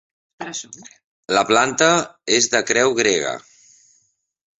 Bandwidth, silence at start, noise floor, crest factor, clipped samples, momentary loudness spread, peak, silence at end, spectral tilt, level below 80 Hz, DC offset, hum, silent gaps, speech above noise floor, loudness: 8.2 kHz; 0.4 s; -65 dBFS; 20 dB; under 0.1%; 16 LU; -2 dBFS; 1.2 s; -2 dB/octave; -62 dBFS; under 0.1%; none; 1.04-1.23 s; 46 dB; -17 LUFS